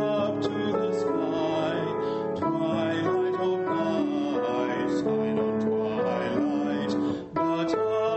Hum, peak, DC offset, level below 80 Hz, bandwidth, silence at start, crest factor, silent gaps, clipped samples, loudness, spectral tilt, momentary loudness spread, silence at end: none; -14 dBFS; under 0.1%; -64 dBFS; 8.2 kHz; 0 s; 12 dB; none; under 0.1%; -27 LUFS; -7 dB/octave; 2 LU; 0 s